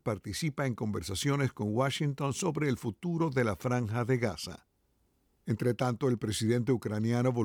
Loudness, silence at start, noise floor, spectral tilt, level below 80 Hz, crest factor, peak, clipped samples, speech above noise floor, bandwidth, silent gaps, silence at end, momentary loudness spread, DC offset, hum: -32 LUFS; 0.05 s; -73 dBFS; -6 dB/octave; -60 dBFS; 14 dB; -16 dBFS; under 0.1%; 42 dB; 17.5 kHz; none; 0 s; 6 LU; under 0.1%; none